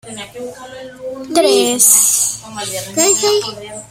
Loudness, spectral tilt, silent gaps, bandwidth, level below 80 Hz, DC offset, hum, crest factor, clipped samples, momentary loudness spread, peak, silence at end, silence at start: -12 LUFS; -1 dB/octave; none; over 20 kHz; -56 dBFS; under 0.1%; none; 16 dB; under 0.1%; 21 LU; 0 dBFS; 0.05 s; 0.05 s